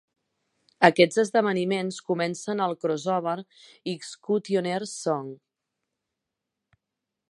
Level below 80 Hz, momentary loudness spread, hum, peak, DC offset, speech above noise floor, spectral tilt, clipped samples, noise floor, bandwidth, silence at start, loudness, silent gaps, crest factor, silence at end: -76 dBFS; 14 LU; none; 0 dBFS; under 0.1%; 60 dB; -5 dB/octave; under 0.1%; -85 dBFS; 11.5 kHz; 0.8 s; -25 LUFS; none; 26 dB; 1.95 s